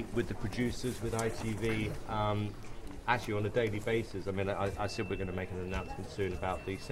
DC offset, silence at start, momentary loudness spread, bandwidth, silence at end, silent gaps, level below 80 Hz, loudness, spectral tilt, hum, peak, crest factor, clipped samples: under 0.1%; 0 s; 6 LU; 15.5 kHz; 0 s; none; -48 dBFS; -36 LUFS; -6 dB/octave; none; -14 dBFS; 22 dB; under 0.1%